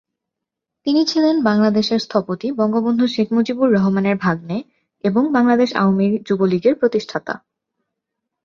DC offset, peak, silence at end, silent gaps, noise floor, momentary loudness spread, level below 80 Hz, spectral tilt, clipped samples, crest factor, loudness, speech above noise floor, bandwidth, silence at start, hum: under 0.1%; -2 dBFS; 1.1 s; none; -82 dBFS; 9 LU; -60 dBFS; -6.5 dB/octave; under 0.1%; 16 dB; -18 LUFS; 65 dB; 7.2 kHz; 0.85 s; none